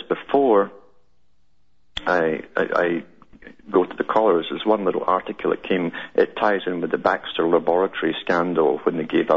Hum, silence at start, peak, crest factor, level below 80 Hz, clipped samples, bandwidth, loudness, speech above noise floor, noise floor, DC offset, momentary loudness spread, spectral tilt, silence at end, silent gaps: none; 0 s; -4 dBFS; 18 dB; -58 dBFS; under 0.1%; 7.6 kHz; -21 LUFS; 47 dB; -67 dBFS; 0.3%; 6 LU; -7 dB/octave; 0 s; none